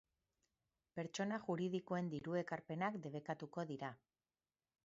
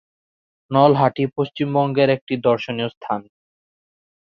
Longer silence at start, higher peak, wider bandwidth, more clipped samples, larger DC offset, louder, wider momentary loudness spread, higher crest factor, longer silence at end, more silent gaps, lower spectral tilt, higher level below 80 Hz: first, 0.95 s vs 0.7 s; second, -26 dBFS vs -2 dBFS; first, 7.6 kHz vs 6.6 kHz; neither; neither; second, -45 LUFS vs -19 LUFS; second, 7 LU vs 11 LU; about the same, 20 dB vs 18 dB; second, 0.9 s vs 1.1 s; second, none vs 2.21-2.27 s, 2.97-3.01 s; second, -5.5 dB/octave vs -8.5 dB/octave; second, -84 dBFS vs -62 dBFS